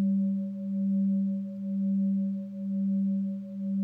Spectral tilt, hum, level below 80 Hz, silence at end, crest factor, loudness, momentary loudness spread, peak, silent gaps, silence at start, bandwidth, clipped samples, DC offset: -12.5 dB/octave; none; -78 dBFS; 0 s; 8 dB; -30 LUFS; 7 LU; -22 dBFS; none; 0 s; 0.6 kHz; under 0.1%; under 0.1%